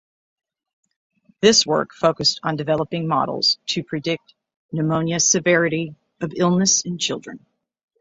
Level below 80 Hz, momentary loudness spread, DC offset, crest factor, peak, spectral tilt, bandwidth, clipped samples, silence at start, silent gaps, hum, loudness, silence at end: -60 dBFS; 14 LU; under 0.1%; 20 dB; -2 dBFS; -3 dB/octave; 8.2 kHz; under 0.1%; 1.4 s; 4.56-4.69 s; none; -19 LUFS; 0.65 s